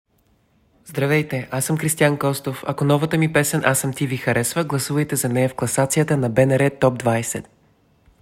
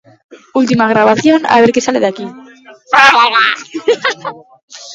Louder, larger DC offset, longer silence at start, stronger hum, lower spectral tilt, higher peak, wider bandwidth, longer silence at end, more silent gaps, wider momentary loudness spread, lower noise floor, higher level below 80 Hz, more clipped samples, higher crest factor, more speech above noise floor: second, -20 LUFS vs -10 LUFS; neither; first, 0.85 s vs 0.3 s; neither; about the same, -5 dB/octave vs -4 dB/octave; about the same, -2 dBFS vs 0 dBFS; first, 16.5 kHz vs 11 kHz; first, 0.8 s vs 0 s; second, none vs 4.63-4.68 s; second, 6 LU vs 14 LU; first, -61 dBFS vs -38 dBFS; about the same, -54 dBFS vs -56 dBFS; second, under 0.1% vs 0.2%; first, 18 dB vs 12 dB; first, 42 dB vs 28 dB